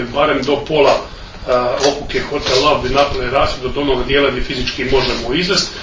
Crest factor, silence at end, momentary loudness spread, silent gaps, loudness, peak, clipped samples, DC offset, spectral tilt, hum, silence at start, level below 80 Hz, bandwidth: 16 dB; 0 s; 7 LU; none; -15 LUFS; 0 dBFS; under 0.1%; under 0.1%; -4 dB/octave; none; 0 s; -30 dBFS; 7.6 kHz